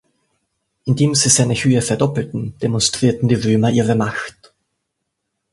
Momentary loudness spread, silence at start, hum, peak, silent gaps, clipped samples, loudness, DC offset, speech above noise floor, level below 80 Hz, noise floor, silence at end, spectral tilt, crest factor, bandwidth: 11 LU; 0.85 s; none; 0 dBFS; none; under 0.1%; -16 LUFS; under 0.1%; 59 dB; -48 dBFS; -76 dBFS; 1.25 s; -4.5 dB/octave; 18 dB; 11.5 kHz